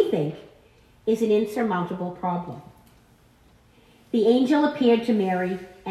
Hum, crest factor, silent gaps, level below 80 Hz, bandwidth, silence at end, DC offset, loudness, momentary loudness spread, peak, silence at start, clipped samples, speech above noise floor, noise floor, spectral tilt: none; 18 dB; none; -62 dBFS; 13.5 kHz; 0 s; under 0.1%; -23 LUFS; 12 LU; -8 dBFS; 0 s; under 0.1%; 34 dB; -56 dBFS; -7 dB/octave